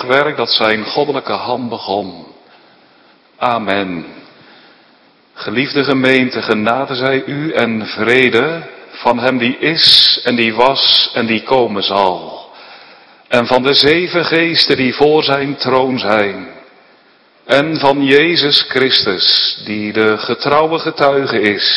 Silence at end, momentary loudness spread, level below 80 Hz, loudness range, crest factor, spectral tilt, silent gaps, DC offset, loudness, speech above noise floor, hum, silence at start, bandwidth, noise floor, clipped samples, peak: 0 s; 10 LU; -54 dBFS; 9 LU; 14 dB; -5 dB/octave; none; under 0.1%; -12 LUFS; 36 dB; none; 0 s; 11 kHz; -49 dBFS; 0.3%; 0 dBFS